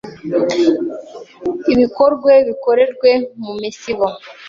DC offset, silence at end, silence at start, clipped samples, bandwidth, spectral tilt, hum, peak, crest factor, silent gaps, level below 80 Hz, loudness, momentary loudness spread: under 0.1%; 0 s; 0.05 s; under 0.1%; 7.4 kHz; -5.5 dB/octave; none; 0 dBFS; 14 dB; none; -54 dBFS; -15 LUFS; 14 LU